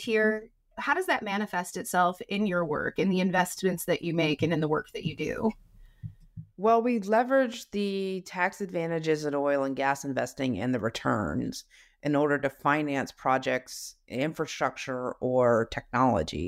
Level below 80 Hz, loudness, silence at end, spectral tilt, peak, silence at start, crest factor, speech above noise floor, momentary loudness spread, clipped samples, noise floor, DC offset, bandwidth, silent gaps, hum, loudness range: -56 dBFS; -28 LUFS; 0 s; -5.5 dB/octave; -12 dBFS; 0 s; 16 dB; 19 dB; 9 LU; under 0.1%; -47 dBFS; under 0.1%; 16 kHz; none; none; 2 LU